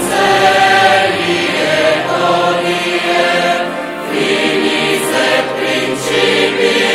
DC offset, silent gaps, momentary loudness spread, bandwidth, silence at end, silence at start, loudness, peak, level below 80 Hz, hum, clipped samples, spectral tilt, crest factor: under 0.1%; none; 6 LU; 16 kHz; 0 s; 0 s; -12 LUFS; 0 dBFS; -50 dBFS; none; under 0.1%; -3 dB/octave; 12 dB